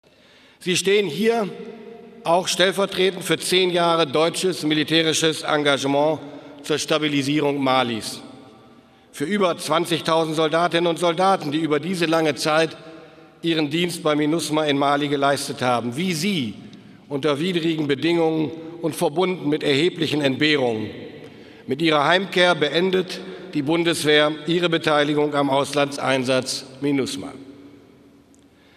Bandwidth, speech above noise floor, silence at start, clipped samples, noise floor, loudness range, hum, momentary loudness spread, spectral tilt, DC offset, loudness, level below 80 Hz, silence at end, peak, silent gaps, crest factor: 15.5 kHz; 32 dB; 0.6 s; under 0.1%; -53 dBFS; 3 LU; none; 12 LU; -4 dB/octave; under 0.1%; -21 LUFS; -66 dBFS; 1.05 s; -2 dBFS; none; 20 dB